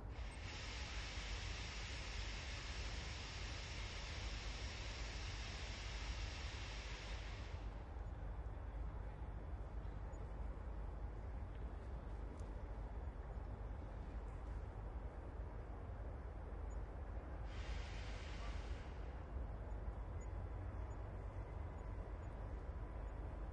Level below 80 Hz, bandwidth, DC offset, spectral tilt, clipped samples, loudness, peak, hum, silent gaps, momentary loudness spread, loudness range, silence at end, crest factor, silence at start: -50 dBFS; 8.8 kHz; under 0.1%; -4.5 dB/octave; under 0.1%; -50 LUFS; -34 dBFS; none; none; 4 LU; 3 LU; 0 s; 14 dB; 0 s